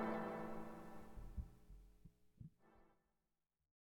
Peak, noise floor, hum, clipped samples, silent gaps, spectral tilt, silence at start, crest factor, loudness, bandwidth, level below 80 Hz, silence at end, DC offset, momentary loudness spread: -32 dBFS; under -90 dBFS; none; under 0.1%; none; -7.5 dB/octave; 0 s; 20 dB; -52 LUFS; 18 kHz; -62 dBFS; 1.05 s; under 0.1%; 20 LU